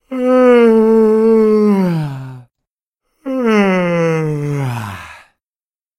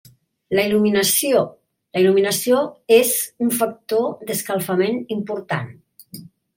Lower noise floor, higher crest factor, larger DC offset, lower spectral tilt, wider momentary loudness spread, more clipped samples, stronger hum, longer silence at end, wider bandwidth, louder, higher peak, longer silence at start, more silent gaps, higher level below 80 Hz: first, under -90 dBFS vs -41 dBFS; about the same, 14 dB vs 18 dB; neither; first, -8 dB/octave vs -4 dB/octave; first, 18 LU vs 12 LU; neither; neither; first, 0.85 s vs 0.35 s; second, 13.5 kHz vs 17 kHz; first, -12 LUFS vs -19 LUFS; about the same, 0 dBFS vs -2 dBFS; second, 0.1 s vs 0.5 s; first, 2.71-2.93 s vs none; first, -54 dBFS vs -64 dBFS